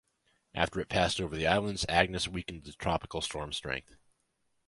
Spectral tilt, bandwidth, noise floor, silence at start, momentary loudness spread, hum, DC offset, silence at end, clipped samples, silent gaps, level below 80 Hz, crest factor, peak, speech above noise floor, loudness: -4 dB/octave; 11.5 kHz; -77 dBFS; 0.55 s; 11 LU; none; under 0.1%; 0.85 s; under 0.1%; none; -50 dBFS; 26 dB; -8 dBFS; 44 dB; -32 LUFS